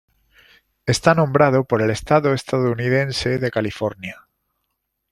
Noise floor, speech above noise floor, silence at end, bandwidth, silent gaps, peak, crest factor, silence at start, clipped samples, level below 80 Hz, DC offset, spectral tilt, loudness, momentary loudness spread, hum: -75 dBFS; 57 dB; 1 s; 13.5 kHz; none; -2 dBFS; 20 dB; 0.85 s; under 0.1%; -48 dBFS; under 0.1%; -6 dB/octave; -19 LUFS; 10 LU; none